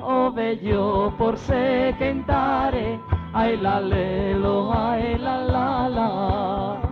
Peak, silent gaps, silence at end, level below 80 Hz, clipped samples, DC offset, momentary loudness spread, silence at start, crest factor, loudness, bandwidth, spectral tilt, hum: -8 dBFS; none; 0 s; -36 dBFS; under 0.1%; under 0.1%; 4 LU; 0 s; 14 dB; -22 LUFS; 7 kHz; -8.5 dB/octave; none